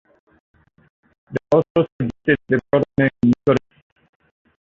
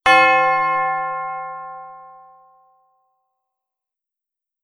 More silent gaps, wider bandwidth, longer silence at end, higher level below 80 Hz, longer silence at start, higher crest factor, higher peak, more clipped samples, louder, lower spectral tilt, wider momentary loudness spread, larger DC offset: first, 1.70-1.75 s, 1.92-1.99 s vs none; second, 7.2 kHz vs 12 kHz; second, 1.1 s vs 2.55 s; first, -50 dBFS vs -60 dBFS; first, 1.3 s vs 0.05 s; about the same, 18 dB vs 22 dB; about the same, -2 dBFS vs 0 dBFS; neither; about the same, -19 LUFS vs -17 LUFS; first, -8.5 dB/octave vs -3 dB/octave; second, 7 LU vs 24 LU; neither